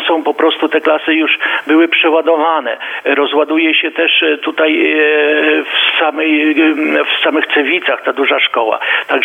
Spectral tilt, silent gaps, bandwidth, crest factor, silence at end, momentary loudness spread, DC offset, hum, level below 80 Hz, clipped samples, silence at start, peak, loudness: -3.5 dB/octave; none; 3.9 kHz; 12 dB; 0 s; 4 LU; under 0.1%; none; -74 dBFS; under 0.1%; 0 s; 0 dBFS; -11 LUFS